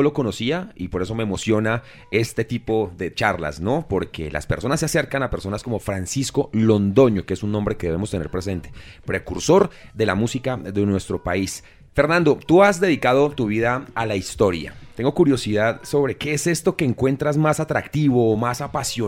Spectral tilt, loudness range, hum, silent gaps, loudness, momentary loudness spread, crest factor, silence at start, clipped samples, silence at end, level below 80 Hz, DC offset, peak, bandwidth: -5.5 dB/octave; 4 LU; none; none; -21 LUFS; 10 LU; 18 dB; 0 s; under 0.1%; 0 s; -42 dBFS; under 0.1%; -4 dBFS; 16.5 kHz